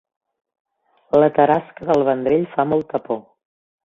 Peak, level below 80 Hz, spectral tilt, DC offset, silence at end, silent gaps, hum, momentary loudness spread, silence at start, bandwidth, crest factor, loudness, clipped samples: -2 dBFS; -58 dBFS; -8.5 dB/octave; under 0.1%; 0.75 s; none; none; 10 LU; 1.15 s; 7 kHz; 18 dB; -19 LUFS; under 0.1%